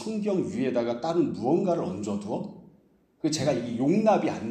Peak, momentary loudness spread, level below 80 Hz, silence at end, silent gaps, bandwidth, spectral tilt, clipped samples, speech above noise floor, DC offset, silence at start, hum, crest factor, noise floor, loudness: -10 dBFS; 9 LU; -66 dBFS; 0 s; none; 10 kHz; -6 dB/octave; under 0.1%; 36 dB; under 0.1%; 0 s; none; 16 dB; -62 dBFS; -27 LUFS